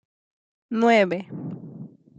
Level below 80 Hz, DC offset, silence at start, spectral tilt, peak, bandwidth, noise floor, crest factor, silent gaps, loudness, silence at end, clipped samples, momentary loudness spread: -76 dBFS; under 0.1%; 0.7 s; -6 dB/octave; -6 dBFS; 8.8 kHz; -42 dBFS; 18 dB; none; -21 LUFS; 0.3 s; under 0.1%; 22 LU